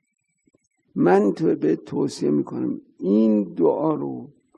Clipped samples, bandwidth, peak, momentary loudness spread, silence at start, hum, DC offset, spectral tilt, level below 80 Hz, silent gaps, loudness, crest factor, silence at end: under 0.1%; 10 kHz; -4 dBFS; 11 LU; 0.95 s; none; under 0.1%; -8 dB/octave; -68 dBFS; none; -22 LUFS; 18 dB; 0.3 s